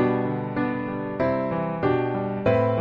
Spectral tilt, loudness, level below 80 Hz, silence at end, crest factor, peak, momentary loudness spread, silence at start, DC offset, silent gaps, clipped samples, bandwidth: -10 dB/octave; -25 LUFS; -52 dBFS; 0 s; 16 dB; -8 dBFS; 5 LU; 0 s; under 0.1%; none; under 0.1%; 6 kHz